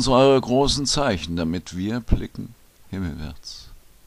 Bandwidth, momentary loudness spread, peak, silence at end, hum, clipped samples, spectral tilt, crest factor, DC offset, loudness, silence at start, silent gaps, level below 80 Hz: 15.5 kHz; 21 LU; -4 dBFS; 0.25 s; none; under 0.1%; -5 dB/octave; 18 dB; under 0.1%; -22 LUFS; 0 s; none; -34 dBFS